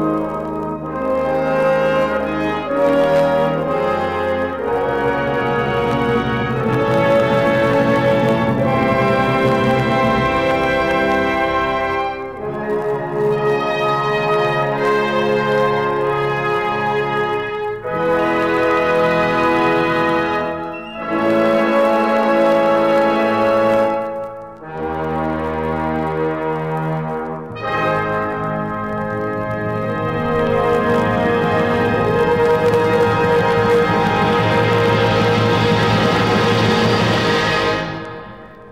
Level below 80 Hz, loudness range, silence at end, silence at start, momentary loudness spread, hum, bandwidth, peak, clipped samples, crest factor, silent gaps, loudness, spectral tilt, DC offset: -42 dBFS; 6 LU; 0 s; 0 s; 8 LU; none; 15.5 kHz; -2 dBFS; under 0.1%; 14 dB; none; -17 LUFS; -6.5 dB/octave; 0.3%